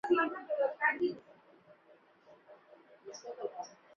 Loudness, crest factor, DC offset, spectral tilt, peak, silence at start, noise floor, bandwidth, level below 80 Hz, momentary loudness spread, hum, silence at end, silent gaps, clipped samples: -34 LUFS; 20 dB; under 0.1%; -2 dB/octave; -18 dBFS; 0.05 s; -64 dBFS; 7 kHz; -84 dBFS; 20 LU; none; 0.3 s; none; under 0.1%